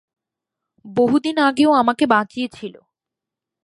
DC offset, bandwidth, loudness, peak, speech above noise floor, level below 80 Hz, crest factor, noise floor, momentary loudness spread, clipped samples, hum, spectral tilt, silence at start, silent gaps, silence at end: under 0.1%; 11.5 kHz; -18 LUFS; 0 dBFS; 69 dB; -62 dBFS; 20 dB; -86 dBFS; 13 LU; under 0.1%; none; -5 dB/octave; 0.85 s; none; 0.95 s